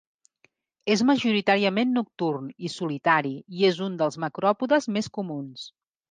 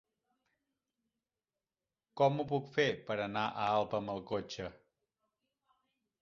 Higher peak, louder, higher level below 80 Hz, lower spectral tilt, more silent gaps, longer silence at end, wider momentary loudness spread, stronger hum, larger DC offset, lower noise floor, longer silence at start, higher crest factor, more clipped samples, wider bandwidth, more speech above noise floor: first, -6 dBFS vs -16 dBFS; first, -25 LUFS vs -35 LUFS; about the same, -72 dBFS vs -70 dBFS; about the same, -5 dB/octave vs -4 dB/octave; neither; second, 0.4 s vs 1.5 s; about the same, 13 LU vs 12 LU; neither; neither; second, -67 dBFS vs under -90 dBFS; second, 0.85 s vs 2.15 s; about the same, 18 dB vs 22 dB; neither; first, 9.6 kHz vs 7.4 kHz; second, 42 dB vs over 56 dB